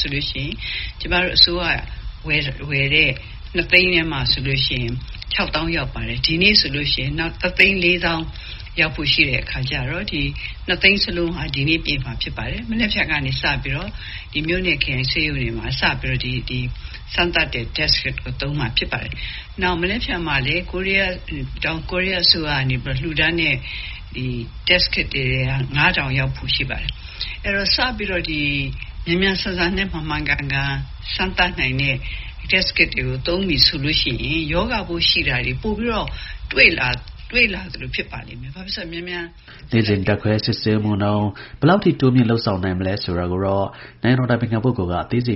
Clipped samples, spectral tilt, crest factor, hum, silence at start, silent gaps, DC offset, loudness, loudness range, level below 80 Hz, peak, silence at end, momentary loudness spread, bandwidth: under 0.1%; -3 dB/octave; 20 dB; none; 0 s; none; under 0.1%; -19 LUFS; 4 LU; -32 dBFS; 0 dBFS; 0 s; 13 LU; 6 kHz